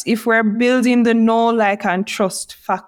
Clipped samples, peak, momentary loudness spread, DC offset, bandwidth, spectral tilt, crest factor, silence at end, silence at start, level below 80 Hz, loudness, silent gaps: under 0.1%; -4 dBFS; 7 LU; under 0.1%; 16.5 kHz; -5 dB/octave; 12 dB; 0.05 s; 0 s; -64 dBFS; -16 LUFS; none